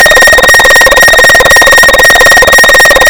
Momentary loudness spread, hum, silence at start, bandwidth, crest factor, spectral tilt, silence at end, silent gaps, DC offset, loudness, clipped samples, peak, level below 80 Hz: 1 LU; none; 0 s; over 20 kHz; 2 dB; -1 dB/octave; 0 s; none; under 0.1%; 0 LUFS; 10%; 0 dBFS; -22 dBFS